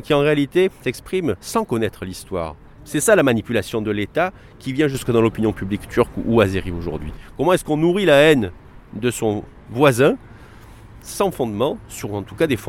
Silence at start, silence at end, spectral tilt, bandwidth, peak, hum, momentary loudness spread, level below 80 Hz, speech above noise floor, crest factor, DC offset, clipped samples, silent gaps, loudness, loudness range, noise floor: 0.05 s; 0 s; -5.5 dB/octave; 16.5 kHz; 0 dBFS; none; 14 LU; -42 dBFS; 23 dB; 18 dB; under 0.1%; under 0.1%; none; -19 LUFS; 3 LU; -42 dBFS